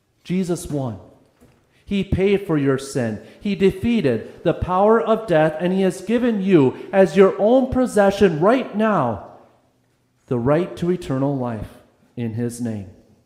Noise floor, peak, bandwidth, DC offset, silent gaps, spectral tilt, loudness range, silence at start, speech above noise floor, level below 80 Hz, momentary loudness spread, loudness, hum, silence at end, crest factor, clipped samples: -63 dBFS; -2 dBFS; 14.5 kHz; under 0.1%; none; -7 dB/octave; 7 LU; 0.25 s; 44 dB; -44 dBFS; 12 LU; -19 LUFS; none; 0.35 s; 18 dB; under 0.1%